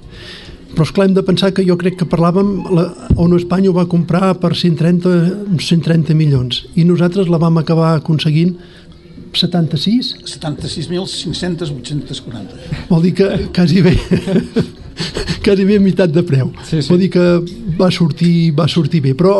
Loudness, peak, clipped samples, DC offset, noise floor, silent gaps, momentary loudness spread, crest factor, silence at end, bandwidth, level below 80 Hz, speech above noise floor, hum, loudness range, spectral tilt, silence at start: -14 LUFS; 0 dBFS; under 0.1%; under 0.1%; -35 dBFS; none; 11 LU; 14 dB; 0 s; 11.5 kHz; -34 dBFS; 22 dB; none; 5 LU; -7 dB/octave; 0.05 s